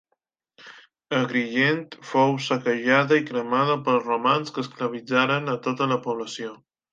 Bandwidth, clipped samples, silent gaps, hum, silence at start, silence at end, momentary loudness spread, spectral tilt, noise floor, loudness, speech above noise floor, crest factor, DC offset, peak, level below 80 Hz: 9 kHz; under 0.1%; none; none; 0.65 s; 0.35 s; 10 LU; -5.5 dB/octave; -77 dBFS; -23 LUFS; 53 dB; 20 dB; under 0.1%; -4 dBFS; -74 dBFS